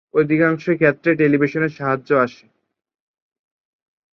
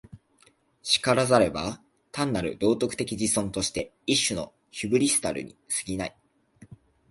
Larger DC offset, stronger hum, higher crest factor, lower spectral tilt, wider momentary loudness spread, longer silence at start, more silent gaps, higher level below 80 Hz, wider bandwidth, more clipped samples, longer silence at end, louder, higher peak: neither; neither; about the same, 18 dB vs 22 dB; first, -9 dB/octave vs -3.5 dB/octave; second, 5 LU vs 14 LU; about the same, 0.15 s vs 0.15 s; neither; second, -62 dBFS vs -54 dBFS; second, 6.6 kHz vs 12 kHz; neither; first, 1.8 s vs 0.35 s; first, -18 LUFS vs -26 LUFS; first, -2 dBFS vs -6 dBFS